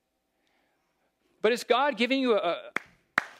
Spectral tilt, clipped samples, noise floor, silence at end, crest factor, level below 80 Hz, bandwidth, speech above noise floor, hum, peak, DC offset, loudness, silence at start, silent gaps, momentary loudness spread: -3.5 dB/octave; under 0.1%; -76 dBFS; 0.1 s; 24 dB; -82 dBFS; 15 kHz; 50 dB; none; -6 dBFS; under 0.1%; -27 LUFS; 1.45 s; none; 10 LU